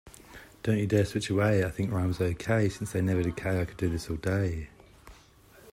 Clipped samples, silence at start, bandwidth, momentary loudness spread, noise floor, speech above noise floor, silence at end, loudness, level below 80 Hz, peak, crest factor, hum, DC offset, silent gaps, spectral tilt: under 0.1%; 0.05 s; 16 kHz; 11 LU; -56 dBFS; 28 dB; 0 s; -29 LUFS; -50 dBFS; -10 dBFS; 18 dB; none; under 0.1%; none; -6.5 dB/octave